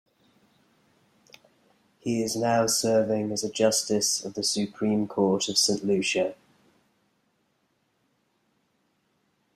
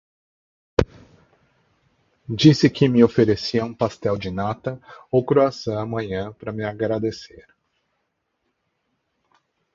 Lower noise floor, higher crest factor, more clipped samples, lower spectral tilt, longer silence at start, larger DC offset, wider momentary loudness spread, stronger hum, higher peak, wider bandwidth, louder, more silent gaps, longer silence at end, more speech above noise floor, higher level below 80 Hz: about the same, -72 dBFS vs -74 dBFS; about the same, 20 dB vs 22 dB; neither; second, -3.5 dB/octave vs -7 dB/octave; first, 2.05 s vs 0.8 s; neither; second, 6 LU vs 14 LU; neither; second, -8 dBFS vs 0 dBFS; first, 14.5 kHz vs 7.6 kHz; second, -25 LUFS vs -21 LUFS; neither; first, 3.2 s vs 2.35 s; second, 47 dB vs 54 dB; second, -68 dBFS vs -46 dBFS